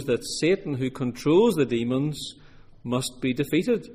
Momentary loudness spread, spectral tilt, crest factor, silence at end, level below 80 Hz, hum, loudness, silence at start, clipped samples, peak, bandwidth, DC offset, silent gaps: 10 LU; -5.5 dB/octave; 16 dB; 0 s; -54 dBFS; none; -25 LUFS; 0 s; under 0.1%; -10 dBFS; 15.5 kHz; under 0.1%; none